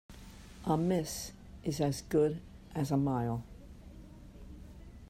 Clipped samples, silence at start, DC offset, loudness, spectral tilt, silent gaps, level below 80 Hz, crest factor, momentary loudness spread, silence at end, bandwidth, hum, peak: under 0.1%; 0.1 s; under 0.1%; -34 LUFS; -6.5 dB/octave; none; -54 dBFS; 18 dB; 22 LU; 0 s; 16 kHz; none; -18 dBFS